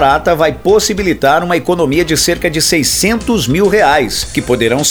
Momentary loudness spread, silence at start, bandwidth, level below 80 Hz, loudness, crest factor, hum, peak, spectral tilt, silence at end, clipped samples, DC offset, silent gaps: 4 LU; 0 s; over 20 kHz; -32 dBFS; -11 LUFS; 12 dB; none; 0 dBFS; -3.5 dB/octave; 0 s; under 0.1%; under 0.1%; none